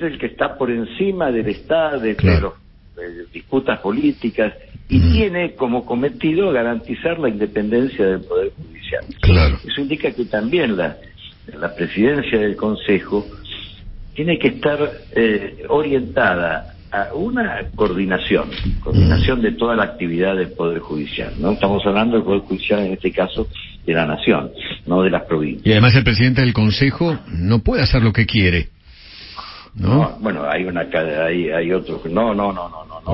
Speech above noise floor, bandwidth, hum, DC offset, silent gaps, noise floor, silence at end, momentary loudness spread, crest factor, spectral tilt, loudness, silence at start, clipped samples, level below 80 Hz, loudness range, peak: 23 dB; 5.8 kHz; none; under 0.1%; none; -40 dBFS; 0 s; 12 LU; 18 dB; -11 dB/octave; -18 LUFS; 0 s; under 0.1%; -30 dBFS; 4 LU; 0 dBFS